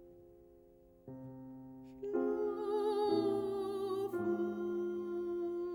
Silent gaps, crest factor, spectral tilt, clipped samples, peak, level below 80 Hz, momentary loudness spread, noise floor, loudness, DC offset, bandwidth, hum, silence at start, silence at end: none; 16 dB; -7.5 dB/octave; under 0.1%; -22 dBFS; -72 dBFS; 18 LU; -63 dBFS; -37 LUFS; under 0.1%; 16.5 kHz; none; 0 s; 0 s